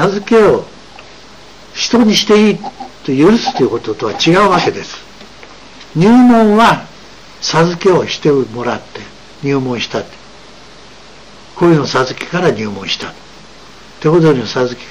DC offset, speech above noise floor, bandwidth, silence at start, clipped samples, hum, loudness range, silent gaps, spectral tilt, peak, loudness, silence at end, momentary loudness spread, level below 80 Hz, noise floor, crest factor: 0.9%; 26 dB; 13 kHz; 0 s; under 0.1%; none; 6 LU; none; -5.5 dB/octave; 0 dBFS; -12 LUFS; 0 s; 17 LU; -44 dBFS; -38 dBFS; 12 dB